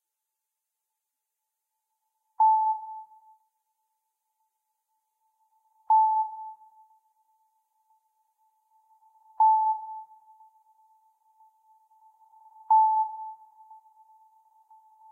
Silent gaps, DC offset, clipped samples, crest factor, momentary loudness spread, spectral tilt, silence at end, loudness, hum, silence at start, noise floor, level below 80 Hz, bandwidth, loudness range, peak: none; under 0.1%; under 0.1%; 18 dB; 21 LU; -3.5 dB/octave; 1.75 s; -24 LUFS; none; 2.4 s; -86 dBFS; under -90 dBFS; 1.4 kHz; 2 LU; -14 dBFS